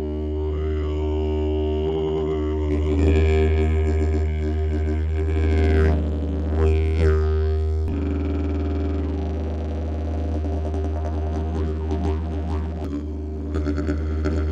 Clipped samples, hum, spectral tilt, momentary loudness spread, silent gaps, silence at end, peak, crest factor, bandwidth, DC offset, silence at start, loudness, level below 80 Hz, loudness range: under 0.1%; none; -9 dB/octave; 7 LU; none; 0 s; -6 dBFS; 14 dB; 7.4 kHz; under 0.1%; 0 s; -23 LUFS; -24 dBFS; 5 LU